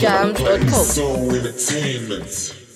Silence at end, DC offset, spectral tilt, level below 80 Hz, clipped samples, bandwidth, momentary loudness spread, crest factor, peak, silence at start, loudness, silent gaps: 0.1 s; under 0.1%; -4 dB/octave; -34 dBFS; under 0.1%; 16 kHz; 10 LU; 16 dB; -2 dBFS; 0 s; -19 LUFS; none